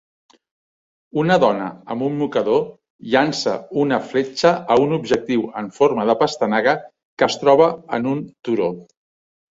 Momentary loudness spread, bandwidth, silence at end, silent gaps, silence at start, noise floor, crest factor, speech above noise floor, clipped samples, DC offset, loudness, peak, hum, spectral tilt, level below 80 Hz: 10 LU; 7.8 kHz; 0.7 s; 2.90-2.99 s, 7.05-7.17 s; 1.15 s; under -90 dBFS; 18 dB; over 72 dB; under 0.1%; under 0.1%; -19 LUFS; -2 dBFS; none; -5.5 dB/octave; -60 dBFS